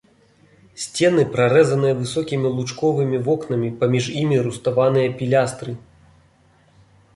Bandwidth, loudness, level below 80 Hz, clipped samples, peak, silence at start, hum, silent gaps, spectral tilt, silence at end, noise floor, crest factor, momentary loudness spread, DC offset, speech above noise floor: 11.5 kHz; -19 LUFS; -56 dBFS; under 0.1%; -4 dBFS; 0.75 s; none; none; -6 dB/octave; 1.35 s; -56 dBFS; 16 dB; 9 LU; under 0.1%; 37 dB